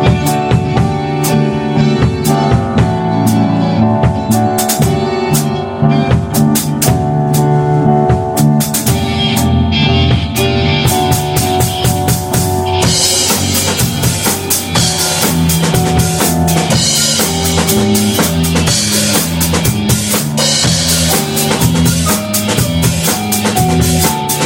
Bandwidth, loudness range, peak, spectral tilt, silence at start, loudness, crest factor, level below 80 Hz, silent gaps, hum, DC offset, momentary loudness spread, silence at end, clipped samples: 17.5 kHz; 1 LU; 0 dBFS; -4.5 dB/octave; 0 s; -11 LUFS; 12 dB; -28 dBFS; none; none; under 0.1%; 3 LU; 0 s; under 0.1%